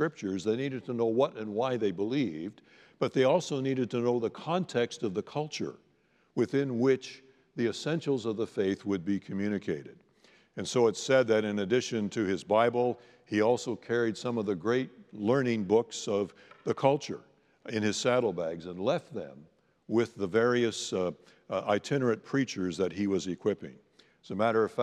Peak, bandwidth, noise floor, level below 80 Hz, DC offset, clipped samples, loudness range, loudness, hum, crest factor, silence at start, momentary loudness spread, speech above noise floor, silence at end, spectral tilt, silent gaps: -10 dBFS; 11.5 kHz; -68 dBFS; -78 dBFS; under 0.1%; under 0.1%; 4 LU; -30 LUFS; none; 20 dB; 0 s; 11 LU; 39 dB; 0 s; -5.5 dB/octave; none